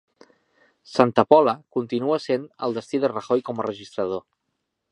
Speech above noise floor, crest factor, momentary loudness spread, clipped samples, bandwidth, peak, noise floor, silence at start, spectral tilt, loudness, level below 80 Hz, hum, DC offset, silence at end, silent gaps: 56 dB; 24 dB; 12 LU; under 0.1%; 10.5 kHz; 0 dBFS; -78 dBFS; 0.9 s; -6.5 dB/octave; -23 LUFS; -68 dBFS; none; under 0.1%; 0.7 s; none